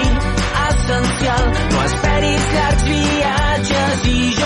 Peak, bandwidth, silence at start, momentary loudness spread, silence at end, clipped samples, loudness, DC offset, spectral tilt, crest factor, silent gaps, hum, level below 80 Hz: -6 dBFS; 11.5 kHz; 0 s; 2 LU; 0 s; under 0.1%; -16 LUFS; under 0.1%; -4.5 dB/octave; 10 dB; none; none; -20 dBFS